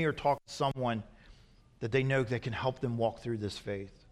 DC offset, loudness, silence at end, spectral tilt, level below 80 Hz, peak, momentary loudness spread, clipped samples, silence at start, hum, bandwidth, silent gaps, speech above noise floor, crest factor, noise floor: under 0.1%; -34 LUFS; 0.15 s; -6.5 dB/octave; -58 dBFS; -16 dBFS; 10 LU; under 0.1%; 0 s; none; 12.5 kHz; none; 27 dB; 18 dB; -60 dBFS